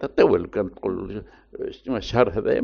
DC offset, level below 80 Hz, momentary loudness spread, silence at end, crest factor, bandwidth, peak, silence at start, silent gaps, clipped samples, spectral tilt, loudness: under 0.1%; -46 dBFS; 16 LU; 0 s; 20 dB; 6.8 kHz; -4 dBFS; 0 s; none; under 0.1%; -5.5 dB/octave; -23 LUFS